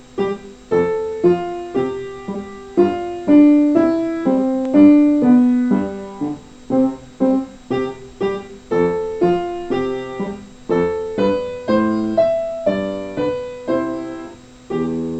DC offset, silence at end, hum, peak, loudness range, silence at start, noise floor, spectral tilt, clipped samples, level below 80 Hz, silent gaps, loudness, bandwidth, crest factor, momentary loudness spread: under 0.1%; 0 s; none; 0 dBFS; 7 LU; 0.15 s; -37 dBFS; -8 dB/octave; under 0.1%; -48 dBFS; none; -18 LUFS; 8.2 kHz; 16 dB; 15 LU